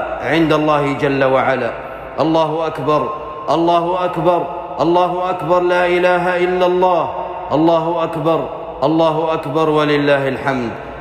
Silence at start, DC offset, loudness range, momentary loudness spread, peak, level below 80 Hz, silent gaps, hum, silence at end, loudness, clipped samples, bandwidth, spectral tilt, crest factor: 0 s; under 0.1%; 2 LU; 7 LU; -4 dBFS; -46 dBFS; none; none; 0 s; -16 LUFS; under 0.1%; 12.5 kHz; -7 dB/octave; 12 dB